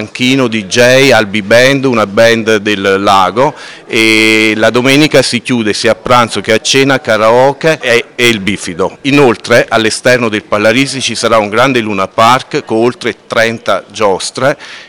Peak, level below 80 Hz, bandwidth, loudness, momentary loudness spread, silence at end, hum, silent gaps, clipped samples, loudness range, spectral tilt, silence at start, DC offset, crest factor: 0 dBFS; -44 dBFS; 19.5 kHz; -9 LUFS; 7 LU; 0.05 s; none; none; 2%; 2 LU; -4 dB/octave; 0 s; 1%; 10 dB